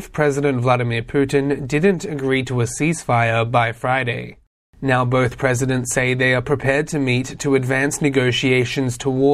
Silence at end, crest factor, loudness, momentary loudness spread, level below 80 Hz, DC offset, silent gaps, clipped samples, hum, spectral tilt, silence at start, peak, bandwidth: 0 s; 16 dB; -19 LUFS; 4 LU; -44 dBFS; under 0.1%; 4.47-4.73 s; under 0.1%; none; -5.5 dB/octave; 0 s; -2 dBFS; 14.5 kHz